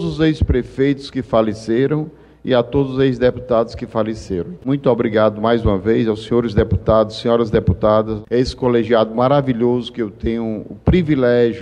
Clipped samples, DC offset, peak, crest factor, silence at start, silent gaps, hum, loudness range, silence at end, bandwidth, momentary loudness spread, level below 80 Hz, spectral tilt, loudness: under 0.1%; under 0.1%; -4 dBFS; 14 dB; 0 s; none; none; 2 LU; 0 s; 10 kHz; 7 LU; -32 dBFS; -8 dB/octave; -17 LUFS